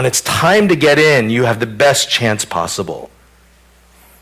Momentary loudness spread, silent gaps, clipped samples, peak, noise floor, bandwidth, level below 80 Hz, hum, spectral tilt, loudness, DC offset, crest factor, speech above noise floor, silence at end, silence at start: 10 LU; none; under 0.1%; -2 dBFS; -48 dBFS; 16 kHz; -46 dBFS; none; -3.5 dB/octave; -13 LUFS; under 0.1%; 12 dB; 35 dB; 1.15 s; 0 s